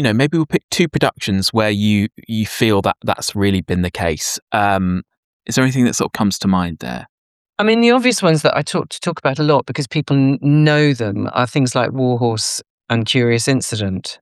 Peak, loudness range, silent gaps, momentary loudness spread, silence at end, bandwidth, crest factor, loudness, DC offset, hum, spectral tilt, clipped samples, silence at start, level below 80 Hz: -2 dBFS; 2 LU; 0.64-0.69 s, 4.42-4.47 s, 5.17-5.40 s, 7.09-7.45 s, 12.70-12.78 s; 8 LU; 0.05 s; 14.5 kHz; 16 dB; -17 LUFS; under 0.1%; none; -5 dB/octave; under 0.1%; 0 s; -48 dBFS